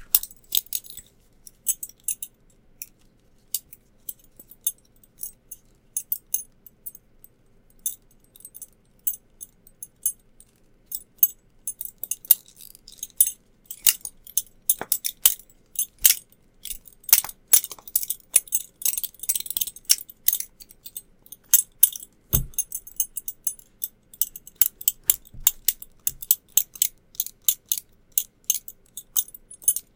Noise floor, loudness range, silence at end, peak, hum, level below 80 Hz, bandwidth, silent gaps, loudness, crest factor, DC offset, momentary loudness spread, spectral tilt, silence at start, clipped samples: -58 dBFS; 12 LU; 0.15 s; 0 dBFS; none; -50 dBFS; 17.5 kHz; none; -23 LUFS; 28 dB; under 0.1%; 22 LU; 0.5 dB/octave; 0 s; under 0.1%